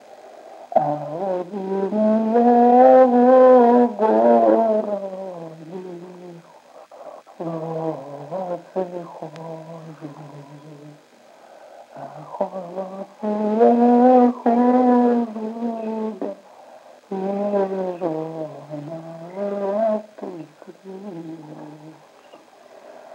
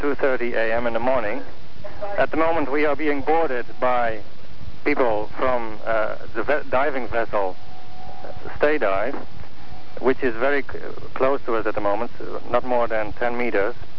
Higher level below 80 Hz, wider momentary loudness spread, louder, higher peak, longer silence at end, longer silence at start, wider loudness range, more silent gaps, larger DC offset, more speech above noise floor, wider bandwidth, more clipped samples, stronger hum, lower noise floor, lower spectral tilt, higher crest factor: second, -88 dBFS vs -46 dBFS; first, 24 LU vs 19 LU; first, -18 LUFS vs -23 LUFS; first, -2 dBFS vs -6 dBFS; about the same, 0 s vs 0.05 s; first, 0.25 s vs 0 s; first, 19 LU vs 2 LU; neither; second, under 0.1% vs 10%; first, 25 dB vs 19 dB; first, 7.4 kHz vs 5.4 kHz; neither; neither; first, -49 dBFS vs -43 dBFS; about the same, -8.5 dB/octave vs -7.5 dB/octave; about the same, 18 dB vs 16 dB